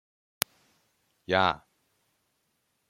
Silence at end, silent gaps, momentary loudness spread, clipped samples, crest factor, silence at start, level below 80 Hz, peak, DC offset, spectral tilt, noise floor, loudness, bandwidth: 1.35 s; none; 14 LU; under 0.1%; 34 dB; 1.3 s; -68 dBFS; 0 dBFS; under 0.1%; -3 dB/octave; -76 dBFS; -29 LUFS; 16.5 kHz